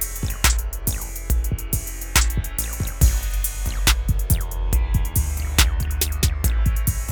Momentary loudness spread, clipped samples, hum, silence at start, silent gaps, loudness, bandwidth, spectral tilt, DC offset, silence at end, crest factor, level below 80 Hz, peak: 6 LU; under 0.1%; none; 0 s; none; -22 LUFS; over 20 kHz; -3 dB/octave; under 0.1%; 0 s; 20 dB; -22 dBFS; 0 dBFS